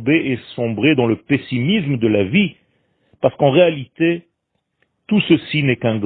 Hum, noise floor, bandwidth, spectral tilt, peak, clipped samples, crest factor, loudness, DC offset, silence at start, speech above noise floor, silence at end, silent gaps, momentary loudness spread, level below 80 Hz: none; -72 dBFS; 4.5 kHz; -11.5 dB/octave; 0 dBFS; under 0.1%; 18 dB; -17 LUFS; under 0.1%; 0 s; 56 dB; 0 s; none; 7 LU; -54 dBFS